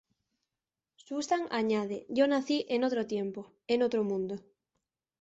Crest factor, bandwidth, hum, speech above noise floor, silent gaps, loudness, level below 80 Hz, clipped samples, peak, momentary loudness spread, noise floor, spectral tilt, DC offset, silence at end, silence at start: 18 dB; 8.2 kHz; none; over 59 dB; none; -31 LUFS; -76 dBFS; under 0.1%; -14 dBFS; 11 LU; under -90 dBFS; -5 dB/octave; under 0.1%; 0.8 s; 1.1 s